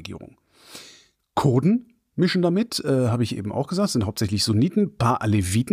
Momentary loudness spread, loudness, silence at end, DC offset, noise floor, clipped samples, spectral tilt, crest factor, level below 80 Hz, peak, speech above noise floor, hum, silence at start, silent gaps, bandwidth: 18 LU; -22 LUFS; 0 s; under 0.1%; -53 dBFS; under 0.1%; -6 dB/octave; 14 dB; -52 dBFS; -8 dBFS; 32 dB; none; 0 s; none; 15.5 kHz